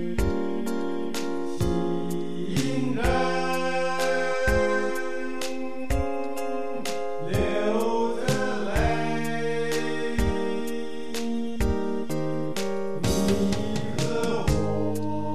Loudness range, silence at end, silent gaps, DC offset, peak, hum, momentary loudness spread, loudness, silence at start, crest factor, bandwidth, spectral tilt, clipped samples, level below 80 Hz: 3 LU; 0 s; none; 3%; -10 dBFS; none; 7 LU; -27 LUFS; 0 s; 16 dB; 14 kHz; -5.5 dB/octave; under 0.1%; -38 dBFS